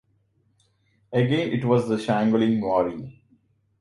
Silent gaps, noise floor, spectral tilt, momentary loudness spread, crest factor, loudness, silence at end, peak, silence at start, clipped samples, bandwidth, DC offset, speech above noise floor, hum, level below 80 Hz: none; -66 dBFS; -7.5 dB/octave; 8 LU; 18 dB; -23 LUFS; 0.7 s; -6 dBFS; 1.1 s; under 0.1%; 11.5 kHz; under 0.1%; 44 dB; none; -60 dBFS